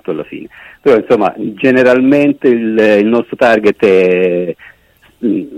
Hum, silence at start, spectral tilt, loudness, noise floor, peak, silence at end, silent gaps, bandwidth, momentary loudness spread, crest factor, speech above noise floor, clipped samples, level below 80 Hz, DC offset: none; 0.1 s; -7 dB/octave; -11 LUFS; -49 dBFS; 0 dBFS; 0 s; none; 10.5 kHz; 13 LU; 12 dB; 38 dB; under 0.1%; -52 dBFS; under 0.1%